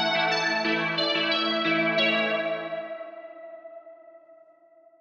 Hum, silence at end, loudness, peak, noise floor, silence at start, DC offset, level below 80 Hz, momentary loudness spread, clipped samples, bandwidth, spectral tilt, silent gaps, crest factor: none; 0.65 s; -24 LUFS; -12 dBFS; -57 dBFS; 0 s; under 0.1%; under -90 dBFS; 21 LU; under 0.1%; 7.6 kHz; -3.5 dB/octave; none; 16 dB